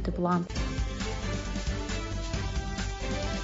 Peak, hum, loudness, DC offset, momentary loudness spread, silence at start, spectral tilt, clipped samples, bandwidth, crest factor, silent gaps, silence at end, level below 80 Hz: -16 dBFS; none; -33 LUFS; under 0.1%; 5 LU; 0 s; -5 dB/octave; under 0.1%; 7.8 kHz; 16 dB; none; 0 s; -36 dBFS